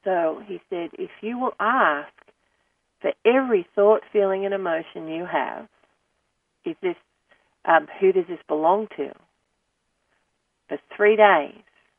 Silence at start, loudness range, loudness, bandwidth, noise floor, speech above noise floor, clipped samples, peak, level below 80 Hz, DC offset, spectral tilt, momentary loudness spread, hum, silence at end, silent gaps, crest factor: 0.05 s; 5 LU; -22 LUFS; 3.6 kHz; -74 dBFS; 52 dB; under 0.1%; -2 dBFS; -76 dBFS; under 0.1%; -8 dB/octave; 16 LU; none; 0.5 s; none; 22 dB